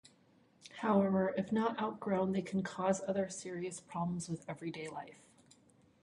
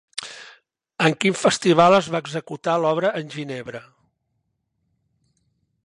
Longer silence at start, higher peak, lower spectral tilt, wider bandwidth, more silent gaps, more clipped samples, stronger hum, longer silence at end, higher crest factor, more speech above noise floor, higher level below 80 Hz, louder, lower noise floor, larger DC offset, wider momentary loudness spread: first, 0.65 s vs 0.15 s; second, -18 dBFS vs -2 dBFS; first, -6 dB/octave vs -4.5 dB/octave; about the same, 11.5 kHz vs 11.5 kHz; neither; neither; neither; second, 0.9 s vs 2.05 s; about the same, 20 dB vs 20 dB; second, 32 dB vs 54 dB; second, -72 dBFS vs -66 dBFS; second, -36 LUFS vs -20 LUFS; second, -68 dBFS vs -74 dBFS; neither; second, 12 LU vs 21 LU